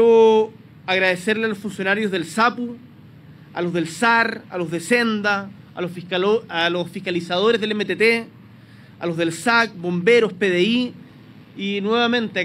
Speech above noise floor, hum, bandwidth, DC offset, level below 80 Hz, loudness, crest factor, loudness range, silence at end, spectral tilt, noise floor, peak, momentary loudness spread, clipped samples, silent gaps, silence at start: 25 dB; none; 14.5 kHz; under 0.1%; -68 dBFS; -20 LUFS; 18 dB; 2 LU; 0 s; -5 dB/octave; -45 dBFS; -4 dBFS; 13 LU; under 0.1%; none; 0 s